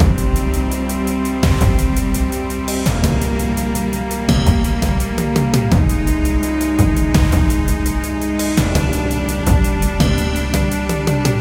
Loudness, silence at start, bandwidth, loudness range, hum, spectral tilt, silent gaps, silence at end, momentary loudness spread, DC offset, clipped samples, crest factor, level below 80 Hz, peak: -17 LUFS; 0 s; 17 kHz; 2 LU; none; -6 dB/octave; none; 0 s; 5 LU; under 0.1%; under 0.1%; 14 dB; -20 dBFS; 0 dBFS